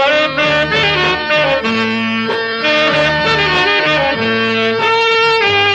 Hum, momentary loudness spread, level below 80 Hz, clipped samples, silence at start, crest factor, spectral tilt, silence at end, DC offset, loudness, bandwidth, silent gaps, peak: none; 4 LU; -42 dBFS; under 0.1%; 0 s; 10 dB; -4.5 dB/octave; 0 s; under 0.1%; -12 LUFS; 9.2 kHz; none; -4 dBFS